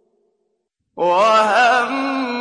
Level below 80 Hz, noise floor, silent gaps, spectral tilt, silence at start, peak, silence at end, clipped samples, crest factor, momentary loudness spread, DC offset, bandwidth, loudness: -70 dBFS; -72 dBFS; none; -3 dB/octave; 0.95 s; -4 dBFS; 0 s; under 0.1%; 14 dB; 8 LU; under 0.1%; 10.5 kHz; -15 LUFS